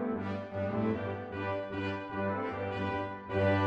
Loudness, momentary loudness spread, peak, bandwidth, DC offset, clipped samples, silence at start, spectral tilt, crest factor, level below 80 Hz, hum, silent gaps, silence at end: -35 LUFS; 5 LU; -18 dBFS; 7 kHz; under 0.1%; under 0.1%; 0 s; -8.5 dB/octave; 16 dB; -62 dBFS; none; none; 0 s